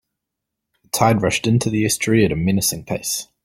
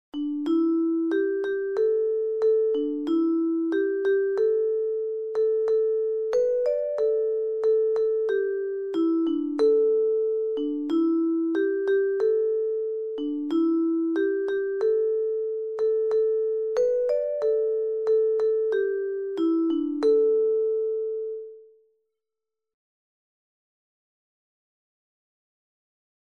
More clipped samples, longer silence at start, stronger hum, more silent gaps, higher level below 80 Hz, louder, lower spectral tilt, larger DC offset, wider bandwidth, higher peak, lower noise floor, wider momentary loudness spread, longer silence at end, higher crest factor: neither; first, 0.95 s vs 0.15 s; neither; neither; first, -46 dBFS vs -72 dBFS; first, -18 LUFS vs -25 LUFS; about the same, -4.5 dB/octave vs -5.5 dB/octave; neither; first, 16.5 kHz vs 6.8 kHz; first, -2 dBFS vs -12 dBFS; second, -81 dBFS vs -88 dBFS; about the same, 7 LU vs 6 LU; second, 0.2 s vs 4.6 s; first, 18 dB vs 12 dB